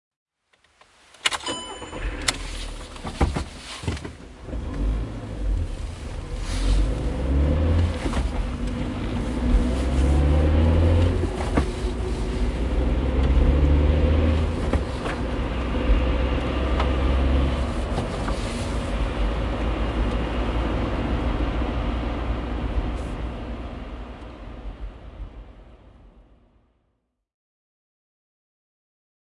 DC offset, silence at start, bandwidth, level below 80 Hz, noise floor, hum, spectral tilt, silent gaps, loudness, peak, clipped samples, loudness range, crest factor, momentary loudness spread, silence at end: under 0.1%; 1.25 s; 11.5 kHz; -26 dBFS; -73 dBFS; none; -6 dB/octave; none; -25 LUFS; -2 dBFS; under 0.1%; 10 LU; 22 dB; 15 LU; 3.2 s